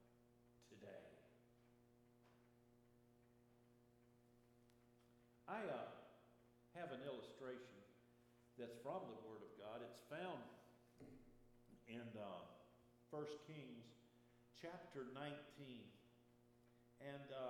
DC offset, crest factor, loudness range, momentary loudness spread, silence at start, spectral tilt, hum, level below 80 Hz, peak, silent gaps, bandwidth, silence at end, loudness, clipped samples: under 0.1%; 22 dB; 4 LU; 15 LU; 0 s; -6 dB/octave; none; -86 dBFS; -36 dBFS; none; 13.5 kHz; 0 s; -56 LUFS; under 0.1%